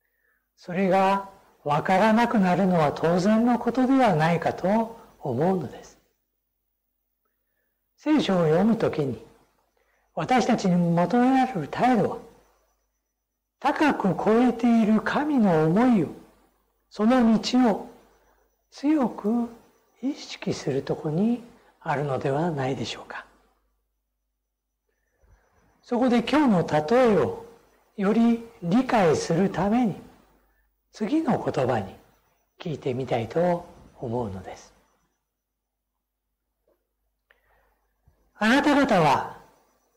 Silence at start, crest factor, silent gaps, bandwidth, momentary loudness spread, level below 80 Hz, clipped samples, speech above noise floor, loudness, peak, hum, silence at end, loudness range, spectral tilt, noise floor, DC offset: 0.7 s; 12 dB; none; 13 kHz; 13 LU; -58 dBFS; under 0.1%; 59 dB; -23 LUFS; -12 dBFS; none; 0.6 s; 9 LU; -6.5 dB/octave; -82 dBFS; under 0.1%